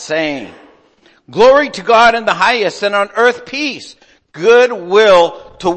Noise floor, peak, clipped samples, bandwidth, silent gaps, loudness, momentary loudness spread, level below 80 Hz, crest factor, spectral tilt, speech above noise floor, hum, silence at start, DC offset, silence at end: -50 dBFS; 0 dBFS; under 0.1%; 8.8 kHz; none; -11 LUFS; 11 LU; -48 dBFS; 12 dB; -3.5 dB/octave; 39 dB; none; 0 s; under 0.1%; 0 s